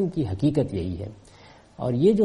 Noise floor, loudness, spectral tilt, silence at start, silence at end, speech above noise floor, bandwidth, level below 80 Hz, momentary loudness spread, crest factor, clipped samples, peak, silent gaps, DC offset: -51 dBFS; -25 LUFS; -9 dB/octave; 0 s; 0 s; 28 dB; 11 kHz; -48 dBFS; 13 LU; 16 dB; under 0.1%; -8 dBFS; none; under 0.1%